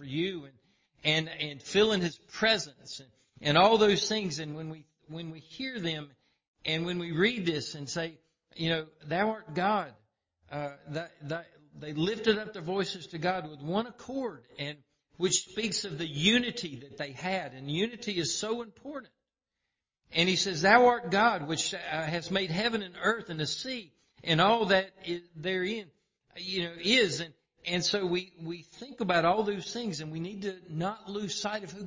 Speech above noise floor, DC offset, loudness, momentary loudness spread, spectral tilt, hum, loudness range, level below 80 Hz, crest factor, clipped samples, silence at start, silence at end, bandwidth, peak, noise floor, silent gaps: 56 dB; under 0.1%; -30 LUFS; 16 LU; -4 dB/octave; none; 7 LU; -64 dBFS; 24 dB; under 0.1%; 0 s; 0 s; 7.8 kHz; -8 dBFS; -87 dBFS; 6.48-6.54 s